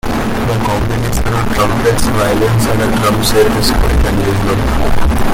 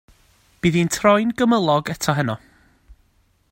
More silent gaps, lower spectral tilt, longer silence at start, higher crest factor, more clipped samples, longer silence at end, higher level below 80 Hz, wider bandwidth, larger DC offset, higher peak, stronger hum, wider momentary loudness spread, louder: neither; about the same, -5.5 dB/octave vs -5.5 dB/octave; second, 0.05 s vs 0.65 s; second, 10 dB vs 20 dB; neither; second, 0 s vs 0.6 s; first, -18 dBFS vs -52 dBFS; about the same, 17 kHz vs 16.5 kHz; neither; about the same, 0 dBFS vs -2 dBFS; neither; second, 4 LU vs 7 LU; first, -13 LUFS vs -19 LUFS